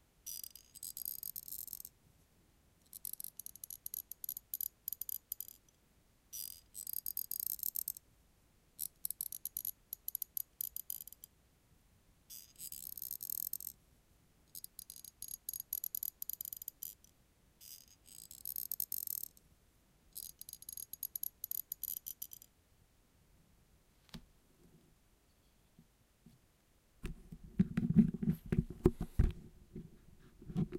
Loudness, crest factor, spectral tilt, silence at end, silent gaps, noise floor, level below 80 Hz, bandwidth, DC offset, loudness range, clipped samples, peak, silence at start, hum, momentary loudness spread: -41 LUFS; 30 dB; -5.5 dB/octave; 0 s; none; -71 dBFS; -52 dBFS; 17 kHz; under 0.1%; 10 LU; under 0.1%; -12 dBFS; 0.25 s; none; 17 LU